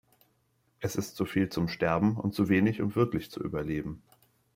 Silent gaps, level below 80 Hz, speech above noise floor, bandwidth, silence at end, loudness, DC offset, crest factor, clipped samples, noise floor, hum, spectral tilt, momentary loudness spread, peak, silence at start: none; -56 dBFS; 43 dB; 16 kHz; 0.6 s; -30 LUFS; under 0.1%; 18 dB; under 0.1%; -72 dBFS; none; -6.5 dB/octave; 10 LU; -12 dBFS; 0.8 s